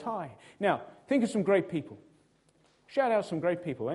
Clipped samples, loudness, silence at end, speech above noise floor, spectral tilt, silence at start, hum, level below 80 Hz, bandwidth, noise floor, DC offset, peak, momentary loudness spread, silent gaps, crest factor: under 0.1%; -30 LUFS; 0 s; 37 dB; -6.5 dB/octave; 0 s; none; -72 dBFS; 11.5 kHz; -67 dBFS; under 0.1%; -12 dBFS; 10 LU; none; 20 dB